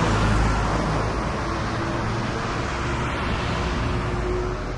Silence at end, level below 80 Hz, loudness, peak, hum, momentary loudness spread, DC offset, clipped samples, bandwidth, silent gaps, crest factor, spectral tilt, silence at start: 0 s; -30 dBFS; -25 LUFS; -8 dBFS; none; 5 LU; under 0.1%; under 0.1%; 11 kHz; none; 14 dB; -6 dB/octave; 0 s